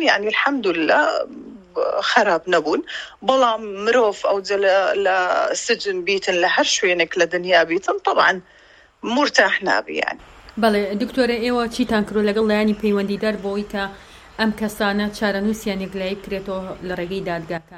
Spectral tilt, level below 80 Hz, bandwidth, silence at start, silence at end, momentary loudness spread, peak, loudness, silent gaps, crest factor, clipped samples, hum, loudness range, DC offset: -3.5 dB/octave; -50 dBFS; 16 kHz; 0 s; 0 s; 11 LU; 0 dBFS; -19 LUFS; none; 20 dB; under 0.1%; none; 5 LU; under 0.1%